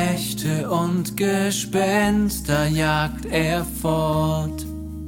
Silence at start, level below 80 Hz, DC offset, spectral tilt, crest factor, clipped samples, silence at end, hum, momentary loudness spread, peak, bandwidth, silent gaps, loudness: 0 s; -38 dBFS; under 0.1%; -5 dB/octave; 18 dB; under 0.1%; 0 s; none; 5 LU; -4 dBFS; 17 kHz; none; -22 LUFS